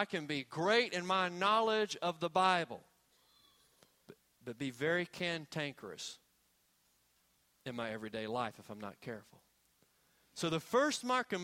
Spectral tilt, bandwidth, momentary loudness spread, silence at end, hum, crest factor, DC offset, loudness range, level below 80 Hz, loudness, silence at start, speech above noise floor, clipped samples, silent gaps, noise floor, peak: -4 dB/octave; 16.5 kHz; 17 LU; 0 s; none; 22 dB; under 0.1%; 11 LU; -78 dBFS; -35 LUFS; 0 s; 39 dB; under 0.1%; none; -75 dBFS; -16 dBFS